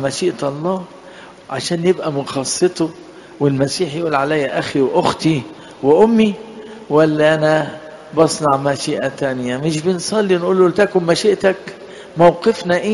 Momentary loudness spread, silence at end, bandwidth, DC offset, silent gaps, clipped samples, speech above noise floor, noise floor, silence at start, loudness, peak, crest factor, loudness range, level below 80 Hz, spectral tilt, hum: 12 LU; 0 s; 11.5 kHz; under 0.1%; none; under 0.1%; 23 dB; -38 dBFS; 0 s; -16 LUFS; 0 dBFS; 16 dB; 4 LU; -54 dBFS; -5 dB/octave; none